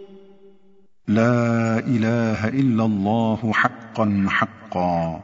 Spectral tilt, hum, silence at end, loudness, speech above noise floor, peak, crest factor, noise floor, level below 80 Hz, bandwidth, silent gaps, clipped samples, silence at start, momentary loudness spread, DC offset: -7.5 dB/octave; none; 0 s; -21 LUFS; 37 dB; -2 dBFS; 18 dB; -58 dBFS; -58 dBFS; 7.6 kHz; none; under 0.1%; 0 s; 5 LU; under 0.1%